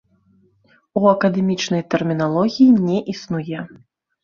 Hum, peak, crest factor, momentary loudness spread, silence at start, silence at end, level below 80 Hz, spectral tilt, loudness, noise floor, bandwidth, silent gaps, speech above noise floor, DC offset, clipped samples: none; -2 dBFS; 18 dB; 13 LU; 0.95 s; 0.55 s; -58 dBFS; -6.5 dB/octave; -18 LUFS; -58 dBFS; 7.2 kHz; none; 40 dB; under 0.1%; under 0.1%